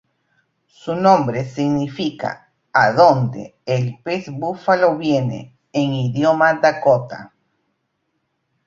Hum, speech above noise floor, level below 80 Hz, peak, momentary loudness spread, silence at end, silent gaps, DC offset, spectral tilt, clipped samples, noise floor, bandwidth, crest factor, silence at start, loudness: none; 54 dB; -60 dBFS; -2 dBFS; 14 LU; 1.4 s; none; under 0.1%; -7 dB/octave; under 0.1%; -71 dBFS; 7.6 kHz; 18 dB; 0.85 s; -18 LUFS